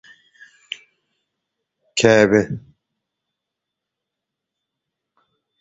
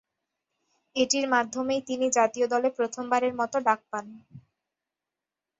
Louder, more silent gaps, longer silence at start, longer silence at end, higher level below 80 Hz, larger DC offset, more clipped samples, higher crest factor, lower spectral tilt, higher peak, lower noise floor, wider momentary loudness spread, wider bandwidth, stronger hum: first, -16 LUFS vs -26 LUFS; neither; first, 1.95 s vs 0.95 s; first, 3 s vs 1.2 s; first, -56 dBFS vs -72 dBFS; neither; neither; about the same, 24 dB vs 20 dB; first, -4.5 dB/octave vs -2 dB/octave; first, 0 dBFS vs -8 dBFS; second, -83 dBFS vs -89 dBFS; first, 21 LU vs 7 LU; about the same, 8 kHz vs 8 kHz; neither